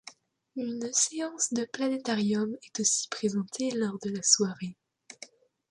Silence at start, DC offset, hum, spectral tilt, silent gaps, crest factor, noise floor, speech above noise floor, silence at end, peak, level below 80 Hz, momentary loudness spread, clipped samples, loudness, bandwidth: 0.05 s; under 0.1%; none; -2.5 dB/octave; none; 24 dB; -53 dBFS; 24 dB; 0.45 s; -8 dBFS; -76 dBFS; 19 LU; under 0.1%; -28 LUFS; 11.5 kHz